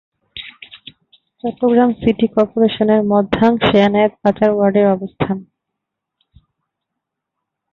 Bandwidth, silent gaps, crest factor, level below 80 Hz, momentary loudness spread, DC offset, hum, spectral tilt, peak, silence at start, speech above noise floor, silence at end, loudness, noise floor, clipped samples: 6.4 kHz; none; 16 dB; -46 dBFS; 19 LU; under 0.1%; none; -8.5 dB/octave; 0 dBFS; 0.35 s; 65 dB; 2.3 s; -15 LUFS; -79 dBFS; under 0.1%